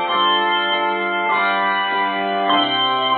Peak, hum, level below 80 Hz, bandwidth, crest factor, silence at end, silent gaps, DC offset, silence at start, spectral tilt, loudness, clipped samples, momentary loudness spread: -6 dBFS; none; -68 dBFS; 4.6 kHz; 14 dB; 0 s; none; under 0.1%; 0 s; -7 dB/octave; -17 LUFS; under 0.1%; 4 LU